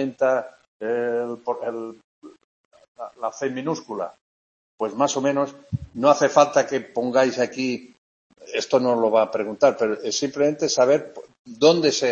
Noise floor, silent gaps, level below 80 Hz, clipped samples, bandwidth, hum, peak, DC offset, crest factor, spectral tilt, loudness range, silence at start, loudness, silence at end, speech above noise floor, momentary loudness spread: under -90 dBFS; 0.68-0.80 s, 2.04-2.22 s, 2.44-2.71 s, 2.88-2.95 s, 4.21-4.78 s, 7.98-8.30 s, 11.39-11.45 s; -62 dBFS; under 0.1%; 8 kHz; none; -2 dBFS; under 0.1%; 20 dB; -4 dB/octave; 9 LU; 0 s; -22 LUFS; 0 s; over 68 dB; 15 LU